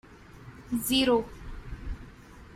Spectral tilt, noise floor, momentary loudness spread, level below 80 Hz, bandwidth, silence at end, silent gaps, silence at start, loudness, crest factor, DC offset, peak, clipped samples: -4 dB/octave; -49 dBFS; 25 LU; -44 dBFS; 16 kHz; 0 s; none; 0.1 s; -27 LUFS; 20 dB; under 0.1%; -12 dBFS; under 0.1%